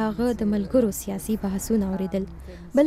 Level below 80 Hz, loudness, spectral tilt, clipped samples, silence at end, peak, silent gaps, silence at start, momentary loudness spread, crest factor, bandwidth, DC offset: -42 dBFS; -25 LUFS; -6.5 dB/octave; under 0.1%; 0 s; -8 dBFS; none; 0 s; 8 LU; 16 dB; 16 kHz; under 0.1%